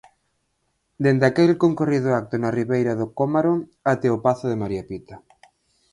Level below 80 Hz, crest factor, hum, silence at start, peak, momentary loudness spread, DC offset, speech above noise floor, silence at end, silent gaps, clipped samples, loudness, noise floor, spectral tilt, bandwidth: -56 dBFS; 18 dB; none; 1 s; -4 dBFS; 9 LU; under 0.1%; 51 dB; 0.75 s; none; under 0.1%; -21 LUFS; -72 dBFS; -8 dB/octave; 11 kHz